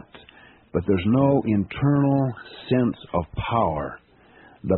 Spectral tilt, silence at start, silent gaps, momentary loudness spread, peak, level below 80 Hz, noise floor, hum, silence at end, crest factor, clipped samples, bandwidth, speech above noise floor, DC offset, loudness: -7.5 dB/octave; 0.15 s; none; 11 LU; -6 dBFS; -46 dBFS; -52 dBFS; none; 0 s; 16 dB; under 0.1%; 4.2 kHz; 30 dB; under 0.1%; -23 LUFS